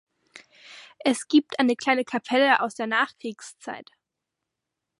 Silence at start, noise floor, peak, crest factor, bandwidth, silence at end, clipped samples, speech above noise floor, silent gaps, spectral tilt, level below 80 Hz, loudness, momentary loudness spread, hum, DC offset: 0.7 s; -84 dBFS; -6 dBFS; 20 dB; 11.5 kHz; 1.2 s; under 0.1%; 60 dB; none; -3 dB/octave; -78 dBFS; -23 LUFS; 18 LU; none; under 0.1%